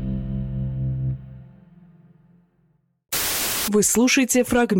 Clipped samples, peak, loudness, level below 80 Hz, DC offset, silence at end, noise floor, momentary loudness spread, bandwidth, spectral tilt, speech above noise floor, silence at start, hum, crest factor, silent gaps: under 0.1%; -8 dBFS; -21 LUFS; -40 dBFS; under 0.1%; 0 s; -64 dBFS; 12 LU; 17.5 kHz; -4 dB/octave; 46 dB; 0 s; none; 16 dB; none